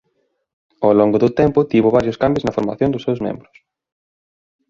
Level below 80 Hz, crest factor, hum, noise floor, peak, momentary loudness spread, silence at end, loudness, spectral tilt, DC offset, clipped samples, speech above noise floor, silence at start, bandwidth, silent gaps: -46 dBFS; 16 dB; none; -68 dBFS; -2 dBFS; 8 LU; 1.3 s; -17 LUFS; -8.5 dB/octave; under 0.1%; under 0.1%; 52 dB; 0.8 s; 7.4 kHz; none